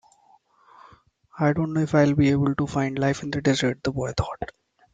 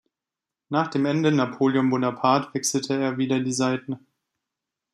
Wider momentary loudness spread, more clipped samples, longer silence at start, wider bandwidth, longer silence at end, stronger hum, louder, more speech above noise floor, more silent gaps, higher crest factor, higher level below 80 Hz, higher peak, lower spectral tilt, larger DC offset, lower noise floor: first, 9 LU vs 6 LU; neither; first, 1.35 s vs 0.7 s; second, 9.2 kHz vs 13.5 kHz; second, 0.5 s vs 0.95 s; neither; about the same, -23 LUFS vs -23 LUFS; second, 37 dB vs 65 dB; neither; about the same, 16 dB vs 20 dB; first, -48 dBFS vs -70 dBFS; about the same, -8 dBFS vs -6 dBFS; first, -6.5 dB/octave vs -5 dB/octave; neither; second, -59 dBFS vs -88 dBFS